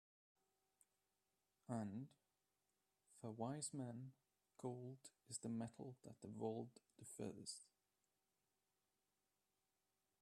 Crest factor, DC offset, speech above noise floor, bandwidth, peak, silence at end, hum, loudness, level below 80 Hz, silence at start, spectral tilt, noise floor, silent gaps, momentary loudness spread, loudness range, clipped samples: 22 dB; under 0.1%; over 38 dB; 13 kHz; -32 dBFS; 2.55 s; 50 Hz at -85 dBFS; -53 LUFS; under -90 dBFS; 1.7 s; -5.5 dB/octave; under -90 dBFS; none; 11 LU; 6 LU; under 0.1%